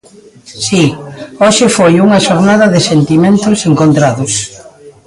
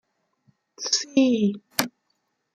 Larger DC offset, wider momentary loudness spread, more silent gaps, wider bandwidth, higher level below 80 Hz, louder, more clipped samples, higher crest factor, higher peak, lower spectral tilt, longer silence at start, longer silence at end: neither; second, 8 LU vs 12 LU; neither; second, 11.5 kHz vs 16 kHz; first, -44 dBFS vs -72 dBFS; first, -9 LUFS vs -24 LUFS; neither; second, 10 dB vs 24 dB; about the same, 0 dBFS vs -2 dBFS; first, -5 dB/octave vs -3.5 dB/octave; second, 0.5 s vs 0.8 s; second, 0.15 s vs 0.65 s